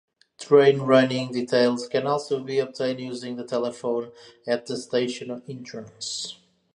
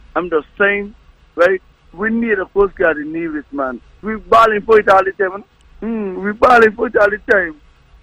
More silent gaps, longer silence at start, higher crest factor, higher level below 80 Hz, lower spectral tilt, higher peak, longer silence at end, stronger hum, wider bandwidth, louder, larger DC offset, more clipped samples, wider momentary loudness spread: neither; first, 0.4 s vs 0.15 s; first, 20 dB vs 14 dB; second, -76 dBFS vs -42 dBFS; about the same, -5 dB/octave vs -6 dB/octave; about the same, -4 dBFS vs -2 dBFS; about the same, 0.4 s vs 0.5 s; neither; about the same, 11 kHz vs 11 kHz; second, -24 LUFS vs -15 LUFS; neither; neither; first, 18 LU vs 14 LU